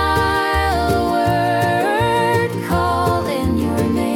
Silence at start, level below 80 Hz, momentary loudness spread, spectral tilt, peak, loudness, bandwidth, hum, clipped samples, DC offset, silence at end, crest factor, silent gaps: 0 s; -34 dBFS; 3 LU; -6 dB/octave; -4 dBFS; -17 LUFS; 18 kHz; none; under 0.1%; under 0.1%; 0 s; 12 dB; none